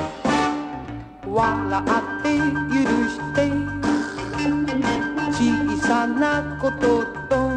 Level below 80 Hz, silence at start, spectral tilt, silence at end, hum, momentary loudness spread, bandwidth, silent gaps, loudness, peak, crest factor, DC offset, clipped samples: -42 dBFS; 0 s; -5.5 dB/octave; 0 s; none; 5 LU; 10 kHz; none; -22 LUFS; -6 dBFS; 16 dB; under 0.1%; under 0.1%